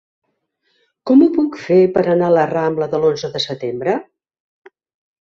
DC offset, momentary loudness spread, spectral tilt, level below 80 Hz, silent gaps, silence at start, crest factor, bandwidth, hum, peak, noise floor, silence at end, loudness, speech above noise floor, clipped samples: under 0.1%; 9 LU; -7 dB/octave; -60 dBFS; none; 1.05 s; 16 dB; 7.4 kHz; none; -2 dBFS; -68 dBFS; 1.2 s; -16 LUFS; 53 dB; under 0.1%